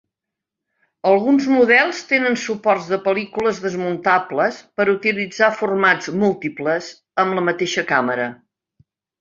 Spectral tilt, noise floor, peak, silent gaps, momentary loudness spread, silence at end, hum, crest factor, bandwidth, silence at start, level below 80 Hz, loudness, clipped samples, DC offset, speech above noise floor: -5 dB/octave; -84 dBFS; -2 dBFS; none; 8 LU; 0.85 s; none; 18 dB; 7.6 kHz; 1.05 s; -64 dBFS; -18 LUFS; under 0.1%; under 0.1%; 66 dB